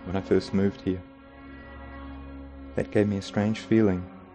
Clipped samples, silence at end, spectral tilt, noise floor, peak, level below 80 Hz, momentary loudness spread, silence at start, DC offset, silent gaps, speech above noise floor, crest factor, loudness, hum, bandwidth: under 0.1%; 0 s; -7.5 dB/octave; -46 dBFS; -8 dBFS; -48 dBFS; 21 LU; 0 s; under 0.1%; none; 21 dB; 20 dB; -26 LUFS; none; 9 kHz